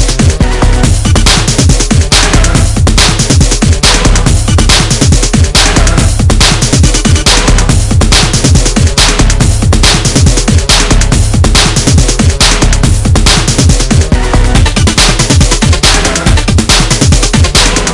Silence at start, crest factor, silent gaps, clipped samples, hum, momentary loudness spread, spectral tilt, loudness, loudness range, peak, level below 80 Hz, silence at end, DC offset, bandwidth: 0 s; 6 dB; none; 3%; none; 3 LU; -3.5 dB/octave; -7 LUFS; 1 LU; 0 dBFS; -10 dBFS; 0 s; 1%; 12 kHz